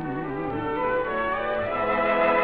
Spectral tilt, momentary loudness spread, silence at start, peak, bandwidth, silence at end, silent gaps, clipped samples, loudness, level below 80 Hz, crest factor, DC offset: -8.5 dB/octave; 8 LU; 0 s; -10 dBFS; 5 kHz; 0 s; none; under 0.1%; -25 LUFS; -50 dBFS; 16 dB; 0.4%